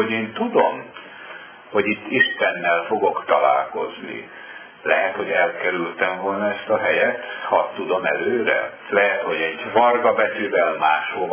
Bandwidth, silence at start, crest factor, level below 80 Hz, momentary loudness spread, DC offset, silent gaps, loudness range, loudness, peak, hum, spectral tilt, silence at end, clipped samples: 3.5 kHz; 0 s; 20 dB; -68 dBFS; 15 LU; under 0.1%; none; 2 LU; -20 LUFS; -2 dBFS; none; -8 dB/octave; 0 s; under 0.1%